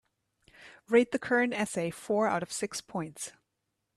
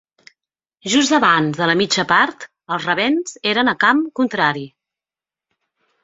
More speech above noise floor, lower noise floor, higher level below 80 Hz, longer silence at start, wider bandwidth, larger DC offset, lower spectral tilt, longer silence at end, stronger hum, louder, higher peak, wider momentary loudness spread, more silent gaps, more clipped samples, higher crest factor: second, 53 dB vs 73 dB; second, -82 dBFS vs -90 dBFS; second, -72 dBFS vs -62 dBFS; second, 0.6 s vs 0.85 s; first, 13 kHz vs 8 kHz; neither; about the same, -4.5 dB/octave vs -3.5 dB/octave; second, 0.65 s vs 1.35 s; neither; second, -30 LUFS vs -16 LUFS; second, -12 dBFS vs -2 dBFS; about the same, 13 LU vs 12 LU; neither; neither; about the same, 20 dB vs 18 dB